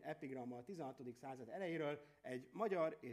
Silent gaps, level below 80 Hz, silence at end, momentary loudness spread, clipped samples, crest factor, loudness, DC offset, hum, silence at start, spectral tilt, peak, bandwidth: none; -88 dBFS; 0 s; 11 LU; under 0.1%; 18 dB; -47 LUFS; under 0.1%; none; 0 s; -6.5 dB/octave; -28 dBFS; 15 kHz